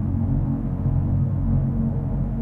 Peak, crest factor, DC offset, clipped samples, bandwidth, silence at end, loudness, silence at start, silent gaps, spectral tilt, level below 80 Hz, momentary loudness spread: -10 dBFS; 12 dB; under 0.1%; under 0.1%; 2.5 kHz; 0 s; -23 LUFS; 0 s; none; -12.5 dB/octave; -30 dBFS; 3 LU